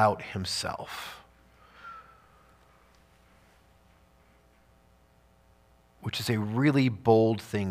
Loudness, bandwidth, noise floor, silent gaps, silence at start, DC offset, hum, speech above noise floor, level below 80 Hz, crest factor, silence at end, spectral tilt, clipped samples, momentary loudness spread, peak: -28 LUFS; 15.5 kHz; -62 dBFS; none; 0 s; under 0.1%; none; 35 dB; -62 dBFS; 24 dB; 0 s; -6 dB/octave; under 0.1%; 23 LU; -8 dBFS